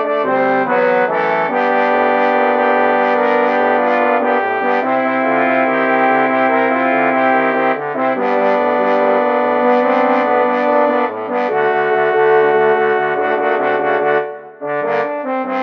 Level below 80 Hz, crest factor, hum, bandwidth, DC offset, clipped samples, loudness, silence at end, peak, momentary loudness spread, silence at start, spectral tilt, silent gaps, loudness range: -72 dBFS; 12 dB; none; 6.2 kHz; under 0.1%; under 0.1%; -14 LUFS; 0 s; -2 dBFS; 5 LU; 0 s; -7 dB/octave; none; 1 LU